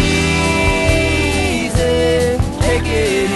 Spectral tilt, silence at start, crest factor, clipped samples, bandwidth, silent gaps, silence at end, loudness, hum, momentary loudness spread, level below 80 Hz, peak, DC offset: -5 dB/octave; 0 s; 14 dB; under 0.1%; 12 kHz; none; 0 s; -15 LUFS; none; 3 LU; -24 dBFS; -2 dBFS; under 0.1%